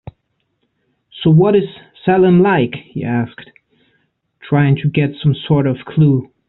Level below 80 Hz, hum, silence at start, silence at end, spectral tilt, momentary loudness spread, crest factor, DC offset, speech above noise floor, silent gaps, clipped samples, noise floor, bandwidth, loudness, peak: -48 dBFS; none; 1.15 s; 0.25 s; -7 dB/octave; 10 LU; 14 dB; under 0.1%; 54 dB; none; under 0.1%; -68 dBFS; 4.1 kHz; -14 LUFS; 0 dBFS